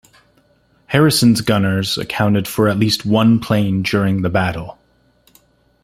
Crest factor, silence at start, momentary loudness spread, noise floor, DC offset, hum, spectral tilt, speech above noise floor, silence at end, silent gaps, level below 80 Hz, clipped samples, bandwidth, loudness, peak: 16 dB; 0.9 s; 6 LU; -57 dBFS; under 0.1%; none; -5.5 dB/octave; 42 dB; 1.1 s; none; -48 dBFS; under 0.1%; 16 kHz; -16 LUFS; -2 dBFS